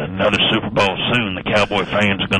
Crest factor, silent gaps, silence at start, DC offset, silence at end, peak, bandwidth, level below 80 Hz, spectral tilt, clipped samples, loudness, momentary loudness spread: 14 dB; none; 0 s; under 0.1%; 0 s; -4 dBFS; 11 kHz; -42 dBFS; -5 dB/octave; under 0.1%; -17 LUFS; 3 LU